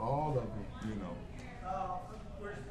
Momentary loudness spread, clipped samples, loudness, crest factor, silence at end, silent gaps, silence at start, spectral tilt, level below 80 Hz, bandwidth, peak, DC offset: 12 LU; under 0.1%; -41 LUFS; 16 dB; 0 s; none; 0 s; -7.5 dB/octave; -50 dBFS; 12.5 kHz; -22 dBFS; under 0.1%